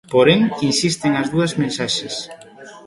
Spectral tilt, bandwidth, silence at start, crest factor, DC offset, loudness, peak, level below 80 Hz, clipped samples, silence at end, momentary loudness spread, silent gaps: -4.5 dB/octave; 11.5 kHz; 0.1 s; 18 dB; under 0.1%; -18 LUFS; 0 dBFS; -52 dBFS; under 0.1%; 0.05 s; 12 LU; none